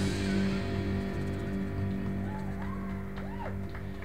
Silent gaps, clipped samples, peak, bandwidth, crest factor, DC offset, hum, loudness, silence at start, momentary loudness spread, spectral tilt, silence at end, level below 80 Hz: none; under 0.1%; -18 dBFS; 15 kHz; 14 dB; 0.6%; none; -34 LUFS; 0 s; 8 LU; -7 dB/octave; 0 s; -44 dBFS